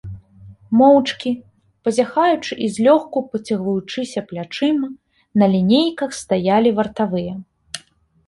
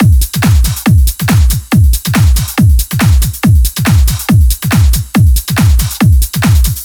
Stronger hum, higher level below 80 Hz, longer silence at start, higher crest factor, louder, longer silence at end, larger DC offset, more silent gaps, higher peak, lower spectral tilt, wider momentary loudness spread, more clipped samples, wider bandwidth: neither; second, -54 dBFS vs -12 dBFS; about the same, 0.05 s vs 0 s; first, 16 dB vs 8 dB; second, -18 LUFS vs -10 LUFS; first, 0.5 s vs 0 s; neither; neither; about the same, -2 dBFS vs 0 dBFS; about the same, -6 dB/octave vs -5 dB/octave; first, 15 LU vs 1 LU; neither; second, 11.5 kHz vs over 20 kHz